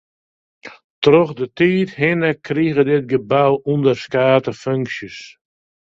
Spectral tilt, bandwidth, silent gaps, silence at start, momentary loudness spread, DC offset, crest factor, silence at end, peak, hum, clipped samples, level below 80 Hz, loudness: -7 dB/octave; 7.6 kHz; 0.84-1.02 s; 0.65 s; 8 LU; under 0.1%; 18 dB; 0.7 s; 0 dBFS; none; under 0.1%; -56 dBFS; -17 LUFS